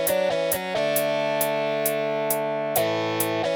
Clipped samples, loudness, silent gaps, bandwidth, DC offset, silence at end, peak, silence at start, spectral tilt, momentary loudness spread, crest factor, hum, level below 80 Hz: under 0.1%; -24 LUFS; none; over 20 kHz; under 0.1%; 0 s; -8 dBFS; 0 s; -3 dB/octave; 2 LU; 16 dB; none; -62 dBFS